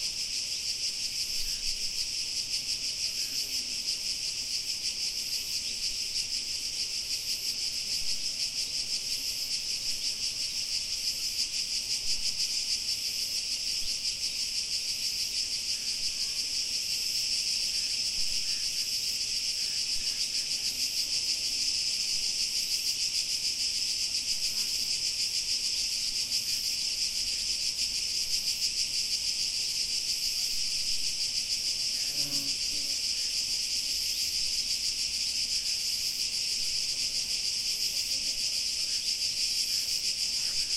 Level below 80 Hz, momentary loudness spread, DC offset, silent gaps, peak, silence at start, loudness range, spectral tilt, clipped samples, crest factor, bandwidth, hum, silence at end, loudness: -54 dBFS; 3 LU; under 0.1%; none; -16 dBFS; 0 s; 2 LU; 2 dB/octave; under 0.1%; 16 dB; 16 kHz; none; 0 s; -28 LUFS